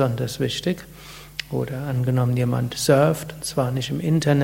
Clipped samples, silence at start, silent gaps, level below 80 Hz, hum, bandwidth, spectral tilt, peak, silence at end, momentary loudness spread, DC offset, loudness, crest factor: under 0.1%; 0 s; none; -50 dBFS; none; 16.5 kHz; -6 dB/octave; -4 dBFS; 0 s; 14 LU; under 0.1%; -23 LUFS; 18 dB